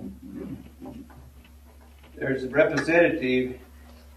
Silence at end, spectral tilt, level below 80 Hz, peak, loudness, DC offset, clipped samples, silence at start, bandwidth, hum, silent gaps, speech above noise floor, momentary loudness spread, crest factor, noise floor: 0 s; -6 dB/octave; -50 dBFS; -6 dBFS; -24 LUFS; under 0.1%; under 0.1%; 0 s; 13.5 kHz; none; none; 27 dB; 22 LU; 22 dB; -50 dBFS